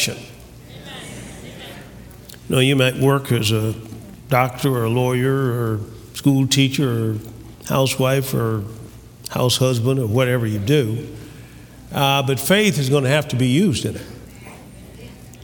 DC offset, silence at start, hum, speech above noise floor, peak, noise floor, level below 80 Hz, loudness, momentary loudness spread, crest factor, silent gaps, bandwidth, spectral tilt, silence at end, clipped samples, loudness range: under 0.1%; 0 s; none; 22 dB; -2 dBFS; -40 dBFS; -48 dBFS; -19 LUFS; 23 LU; 20 dB; none; 19.5 kHz; -5 dB/octave; 0 s; under 0.1%; 2 LU